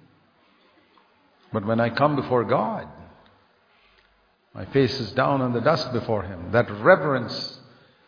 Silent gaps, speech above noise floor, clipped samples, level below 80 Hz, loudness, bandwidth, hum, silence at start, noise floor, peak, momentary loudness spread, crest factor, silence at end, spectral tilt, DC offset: none; 40 dB; under 0.1%; -58 dBFS; -23 LUFS; 5.2 kHz; none; 1.5 s; -63 dBFS; -2 dBFS; 14 LU; 24 dB; 0.5 s; -7 dB/octave; under 0.1%